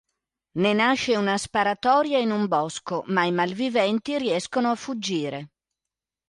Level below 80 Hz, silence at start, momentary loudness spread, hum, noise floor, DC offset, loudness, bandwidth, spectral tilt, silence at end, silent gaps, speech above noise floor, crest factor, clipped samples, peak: -64 dBFS; 0.55 s; 8 LU; none; -88 dBFS; under 0.1%; -24 LUFS; 11.5 kHz; -4.5 dB/octave; 0.85 s; none; 65 dB; 16 dB; under 0.1%; -8 dBFS